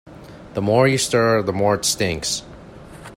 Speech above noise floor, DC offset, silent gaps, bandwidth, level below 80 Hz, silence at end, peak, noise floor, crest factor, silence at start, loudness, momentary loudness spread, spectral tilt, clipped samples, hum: 21 dB; under 0.1%; none; 16 kHz; -48 dBFS; 0 s; -2 dBFS; -40 dBFS; 18 dB; 0.05 s; -19 LUFS; 10 LU; -4 dB/octave; under 0.1%; none